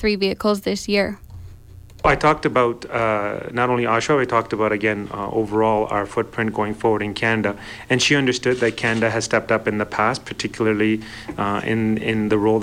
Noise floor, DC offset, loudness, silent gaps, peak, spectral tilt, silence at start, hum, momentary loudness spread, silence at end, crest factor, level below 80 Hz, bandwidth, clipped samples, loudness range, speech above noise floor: -41 dBFS; under 0.1%; -20 LUFS; none; -4 dBFS; -5 dB/octave; 0 s; none; 7 LU; 0 s; 16 dB; -44 dBFS; 16 kHz; under 0.1%; 2 LU; 21 dB